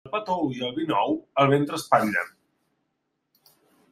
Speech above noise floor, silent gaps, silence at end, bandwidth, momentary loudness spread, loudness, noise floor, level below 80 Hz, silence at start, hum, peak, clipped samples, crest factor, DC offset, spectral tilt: 53 dB; none; 1.65 s; 15.5 kHz; 7 LU; -24 LUFS; -77 dBFS; -68 dBFS; 0.05 s; none; -4 dBFS; under 0.1%; 22 dB; under 0.1%; -5.5 dB/octave